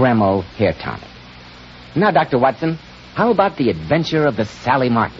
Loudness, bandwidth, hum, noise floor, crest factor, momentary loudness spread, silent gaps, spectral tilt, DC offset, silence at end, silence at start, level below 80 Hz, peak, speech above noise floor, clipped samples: -17 LUFS; 7.6 kHz; none; -39 dBFS; 16 dB; 15 LU; none; -7.5 dB/octave; under 0.1%; 0 s; 0 s; -46 dBFS; 0 dBFS; 22 dB; under 0.1%